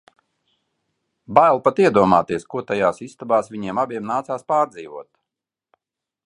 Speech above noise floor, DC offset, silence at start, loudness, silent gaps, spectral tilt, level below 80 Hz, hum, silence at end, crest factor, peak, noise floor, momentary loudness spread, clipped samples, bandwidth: 67 dB; under 0.1%; 1.3 s; -19 LUFS; none; -6.5 dB/octave; -58 dBFS; none; 1.25 s; 20 dB; 0 dBFS; -86 dBFS; 12 LU; under 0.1%; 11 kHz